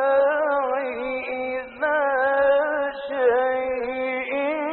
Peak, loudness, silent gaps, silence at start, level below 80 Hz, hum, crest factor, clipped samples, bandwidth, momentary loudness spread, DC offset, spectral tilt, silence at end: -10 dBFS; -23 LUFS; none; 0 s; -58 dBFS; none; 14 dB; under 0.1%; 4.3 kHz; 8 LU; under 0.1%; -1 dB/octave; 0 s